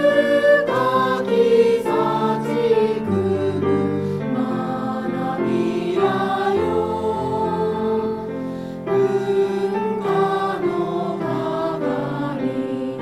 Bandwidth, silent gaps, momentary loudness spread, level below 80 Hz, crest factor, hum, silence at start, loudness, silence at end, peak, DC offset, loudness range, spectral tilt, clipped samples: 14 kHz; none; 8 LU; -54 dBFS; 16 dB; none; 0 s; -20 LUFS; 0 s; -4 dBFS; under 0.1%; 4 LU; -7 dB/octave; under 0.1%